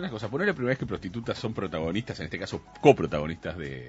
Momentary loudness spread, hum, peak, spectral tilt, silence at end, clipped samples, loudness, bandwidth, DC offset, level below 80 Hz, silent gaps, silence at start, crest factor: 13 LU; none; -4 dBFS; -6.5 dB/octave; 0 s; under 0.1%; -28 LUFS; 8 kHz; under 0.1%; -52 dBFS; none; 0 s; 24 dB